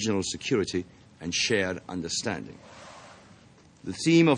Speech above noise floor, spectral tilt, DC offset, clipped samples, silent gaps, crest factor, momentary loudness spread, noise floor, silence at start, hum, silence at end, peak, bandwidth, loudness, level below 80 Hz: 28 dB; -4 dB/octave; under 0.1%; under 0.1%; none; 20 dB; 22 LU; -55 dBFS; 0 s; none; 0 s; -8 dBFS; 11 kHz; -28 LUFS; -64 dBFS